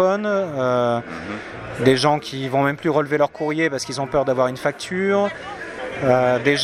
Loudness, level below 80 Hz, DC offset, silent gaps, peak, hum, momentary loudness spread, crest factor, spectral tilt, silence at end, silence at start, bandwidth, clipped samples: -20 LUFS; -52 dBFS; under 0.1%; none; -2 dBFS; none; 13 LU; 18 dB; -5.5 dB/octave; 0 s; 0 s; 14.5 kHz; under 0.1%